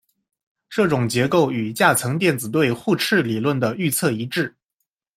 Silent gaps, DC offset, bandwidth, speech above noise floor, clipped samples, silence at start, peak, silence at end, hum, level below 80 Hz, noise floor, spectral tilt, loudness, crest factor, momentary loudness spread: none; under 0.1%; 16.5 kHz; 58 dB; under 0.1%; 0.7 s; -2 dBFS; 0.7 s; none; -60 dBFS; -78 dBFS; -5 dB/octave; -20 LUFS; 20 dB; 6 LU